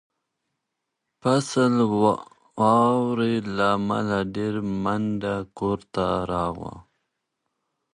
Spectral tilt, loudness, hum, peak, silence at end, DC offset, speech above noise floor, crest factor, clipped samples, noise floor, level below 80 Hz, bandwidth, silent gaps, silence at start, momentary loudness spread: -6.5 dB/octave; -24 LUFS; none; -6 dBFS; 1.15 s; under 0.1%; 58 dB; 18 dB; under 0.1%; -81 dBFS; -52 dBFS; 11.5 kHz; none; 1.25 s; 9 LU